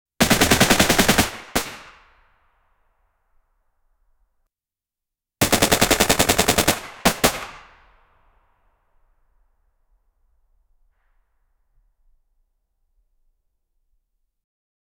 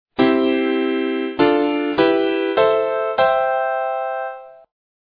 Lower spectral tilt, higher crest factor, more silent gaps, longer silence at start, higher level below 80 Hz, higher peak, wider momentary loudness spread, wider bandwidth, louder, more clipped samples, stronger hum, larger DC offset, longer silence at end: second, -2.5 dB/octave vs -8 dB/octave; first, 24 dB vs 16 dB; neither; about the same, 0.2 s vs 0.2 s; first, -42 dBFS vs -58 dBFS; about the same, 0 dBFS vs -2 dBFS; first, 11 LU vs 7 LU; first, over 20 kHz vs 5 kHz; about the same, -17 LUFS vs -18 LUFS; neither; neither; neither; first, 7.4 s vs 0.55 s